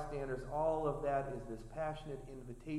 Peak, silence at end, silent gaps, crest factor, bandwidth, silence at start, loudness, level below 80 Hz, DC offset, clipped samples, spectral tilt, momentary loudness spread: -24 dBFS; 0 s; none; 16 dB; 12.5 kHz; 0 s; -40 LUFS; -52 dBFS; under 0.1%; under 0.1%; -7.5 dB/octave; 12 LU